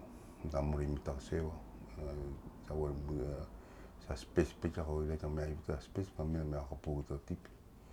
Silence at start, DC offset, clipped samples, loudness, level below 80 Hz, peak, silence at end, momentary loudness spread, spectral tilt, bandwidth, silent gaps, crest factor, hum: 0 s; under 0.1%; under 0.1%; -41 LUFS; -46 dBFS; -18 dBFS; 0 s; 14 LU; -7.5 dB/octave; 14 kHz; none; 24 dB; none